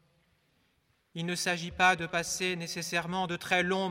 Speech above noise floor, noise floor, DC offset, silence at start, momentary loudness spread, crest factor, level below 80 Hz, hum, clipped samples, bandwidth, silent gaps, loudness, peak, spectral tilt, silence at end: 42 dB; -72 dBFS; under 0.1%; 1.15 s; 9 LU; 22 dB; -62 dBFS; none; under 0.1%; 16.5 kHz; none; -30 LUFS; -12 dBFS; -3 dB/octave; 0 s